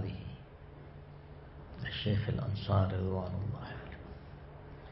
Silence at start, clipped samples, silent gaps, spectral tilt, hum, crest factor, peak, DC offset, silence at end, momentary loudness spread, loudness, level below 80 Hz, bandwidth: 0 s; under 0.1%; none; -6 dB/octave; none; 22 dB; -16 dBFS; under 0.1%; 0 s; 20 LU; -36 LUFS; -52 dBFS; 5.6 kHz